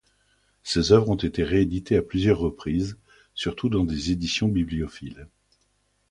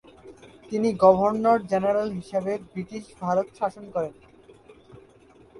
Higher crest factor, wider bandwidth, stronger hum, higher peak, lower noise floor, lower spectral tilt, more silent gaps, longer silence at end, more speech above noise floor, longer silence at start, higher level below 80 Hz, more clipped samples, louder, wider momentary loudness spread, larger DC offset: about the same, 22 dB vs 22 dB; about the same, 11.5 kHz vs 11.5 kHz; first, 50 Hz at -45 dBFS vs none; about the same, -4 dBFS vs -4 dBFS; first, -69 dBFS vs -54 dBFS; second, -6 dB/octave vs -7.5 dB/octave; neither; first, 0.85 s vs 0 s; first, 45 dB vs 30 dB; first, 0.65 s vs 0.25 s; first, -40 dBFS vs -60 dBFS; neither; about the same, -24 LUFS vs -24 LUFS; about the same, 14 LU vs 15 LU; neither